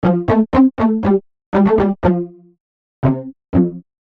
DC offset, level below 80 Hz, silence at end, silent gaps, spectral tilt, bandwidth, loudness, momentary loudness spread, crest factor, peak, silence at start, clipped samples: under 0.1%; -38 dBFS; 0.2 s; 1.46-1.52 s, 2.60-3.02 s; -10.5 dB/octave; 5.6 kHz; -16 LUFS; 8 LU; 14 dB; -2 dBFS; 0.05 s; under 0.1%